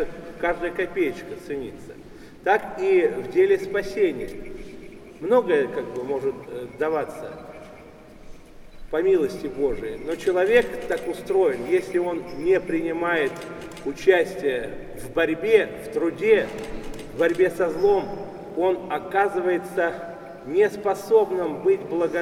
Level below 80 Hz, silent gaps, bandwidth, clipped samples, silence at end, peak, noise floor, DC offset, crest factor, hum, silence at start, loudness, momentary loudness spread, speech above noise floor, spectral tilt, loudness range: -48 dBFS; none; 14.5 kHz; under 0.1%; 0 s; -4 dBFS; -45 dBFS; under 0.1%; 20 dB; none; 0 s; -23 LUFS; 16 LU; 22 dB; -5.5 dB/octave; 4 LU